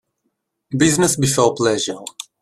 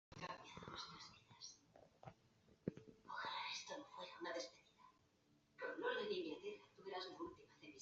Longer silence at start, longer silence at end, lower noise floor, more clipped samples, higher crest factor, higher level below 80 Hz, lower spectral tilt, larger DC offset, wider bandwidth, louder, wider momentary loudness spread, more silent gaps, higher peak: first, 0.7 s vs 0.1 s; first, 0.2 s vs 0 s; second, -73 dBFS vs -78 dBFS; neither; second, 18 dB vs 24 dB; first, -50 dBFS vs -82 dBFS; first, -4 dB/octave vs -2 dB/octave; neither; first, 15 kHz vs 7.6 kHz; first, -17 LUFS vs -51 LUFS; second, 14 LU vs 18 LU; neither; first, -2 dBFS vs -28 dBFS